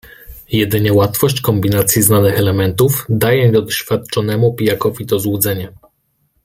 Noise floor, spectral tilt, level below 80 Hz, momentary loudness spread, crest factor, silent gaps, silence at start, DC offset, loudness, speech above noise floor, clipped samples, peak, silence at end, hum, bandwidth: -62 dBFS; -5 dB/octave; -44 dBFS; 7 LU; 14 dB; none; 0.3 s; under 0.1%; -14 LUFS; 49 dB; under 0.1%; 0 dBFS; 0.75 s; none; 16.5 kHz